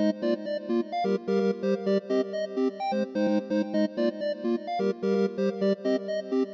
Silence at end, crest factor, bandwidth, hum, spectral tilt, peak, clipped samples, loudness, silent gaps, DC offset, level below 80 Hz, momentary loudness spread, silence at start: 0 s; 12 dB; 7.2 kHz; none; -7.5 dB/octave; -14 dBFS; under 0.1%; -28 LUFS; none; under 0.1%; -80 dBFS; 3 LU; 0 s